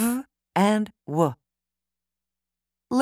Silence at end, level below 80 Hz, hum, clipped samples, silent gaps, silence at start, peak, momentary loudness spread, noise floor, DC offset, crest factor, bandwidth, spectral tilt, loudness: 0 s; -68 dBFS; none; under 0.1%; none; 0 s; -6 dBFS; 8 LU; -88 dBFS; under 0.1%; 20 dB; 16 kHz; -6 dB/octave; -25 LUFS